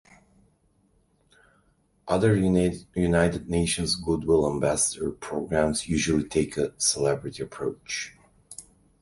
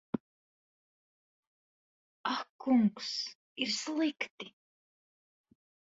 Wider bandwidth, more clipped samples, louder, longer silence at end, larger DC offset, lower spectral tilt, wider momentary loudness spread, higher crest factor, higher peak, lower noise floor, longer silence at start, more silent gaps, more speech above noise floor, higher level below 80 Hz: first, 11.5 kHz vs 8 kHz; neither; first, -25 LUFS vs -34 LUFS; second, 0.4 s vs 1.35 s; neither; about the same, -4.5 dB/octave vs -4 dB/octave; about the same, 11 LU vs 13 LU; about the same, 20 dB vs 20 dB; first, -6 dBFS vs -18 dBFS; second, -66 dBFS vs under -90 dBFS; first, 2.05 s vs 0.15 s; second, none vs 0.20-2.24 s, 2.50-2.59 s, 3.35-3.56 s, 4.31-4.38 s; second, 41 dB vs over 58 dB; first, -46 dBFS vs -80 dBFS